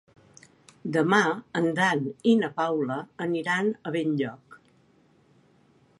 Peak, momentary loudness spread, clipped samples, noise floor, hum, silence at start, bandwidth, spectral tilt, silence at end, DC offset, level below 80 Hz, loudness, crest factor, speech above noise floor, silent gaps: -8 dBFS; 8 LU; under 0.1%; -62 dBFS; none; 0.85 s; 11.5 kHz; -5.5 dB/octave; 1.45 s; under 0.1%; -74 dBFS; -26 LUFS; 20 dB; 36 dB; none